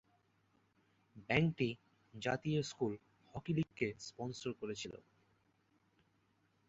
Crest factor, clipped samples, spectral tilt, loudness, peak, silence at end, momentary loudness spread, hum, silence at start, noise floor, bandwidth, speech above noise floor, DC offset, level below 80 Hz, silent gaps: 26 dB; under 0.1%; -5.5 dB/octave; -40 LUFS; -16 dBFS; 1.75 s; 18 LU; none; 1.15 s; -77 dBFS; 8 kHz; 38 dB; under 0.1%; -70 dBFS; none